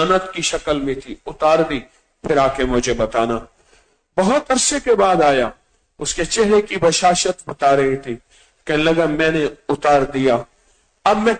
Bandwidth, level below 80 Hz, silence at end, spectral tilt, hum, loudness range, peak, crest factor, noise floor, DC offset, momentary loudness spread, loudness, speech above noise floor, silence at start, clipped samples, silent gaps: 9.4 kHz; -40 dBFS; 0 s; -3.5 dB/octave; none; 3 LU; -4 dBFS; 14 dB; -58 dBFS; under 0.1%; 11 LU; -17 LUFS; 42 dB; 0 s; under 0.1%; none